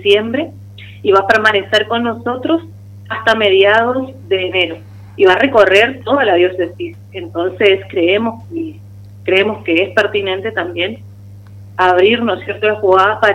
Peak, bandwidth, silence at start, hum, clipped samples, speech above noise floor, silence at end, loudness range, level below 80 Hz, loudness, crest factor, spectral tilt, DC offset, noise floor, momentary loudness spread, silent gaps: 0 dBFS; 11 kHz; 0 s; 50 Hz at -35 dBFS; under 0.1%; 22 dB; 0 s; 4 LU; -52 dBFS; -13 LUFS; 14 dB; -5.5 dB/octave; under 0.1%; -35 dBFS; 15 LU; none